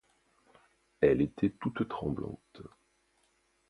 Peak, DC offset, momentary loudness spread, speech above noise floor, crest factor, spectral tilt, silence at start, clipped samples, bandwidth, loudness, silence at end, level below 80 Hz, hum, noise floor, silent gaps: -12 dBFS; under 0.1%; 26 LU; 41 dB; 22 dB; -9 dB/octave; 1 s; under 0.1%; 11 kHz; -32 LUFS; 1 s; -58 dBFS; none; -73 dBFS; none